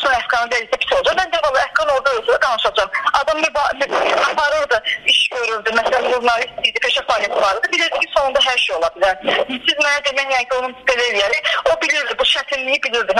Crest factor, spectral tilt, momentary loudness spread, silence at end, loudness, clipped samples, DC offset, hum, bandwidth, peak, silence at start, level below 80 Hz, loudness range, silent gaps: 16 dB; -0.5 dB/octave; 3 LU; 0 s; -16 LUFS; under 0.1%; under 0.1%; none; 13 kHz; 0 dBFS; 0 s; -48 dBFS; 1 LU; none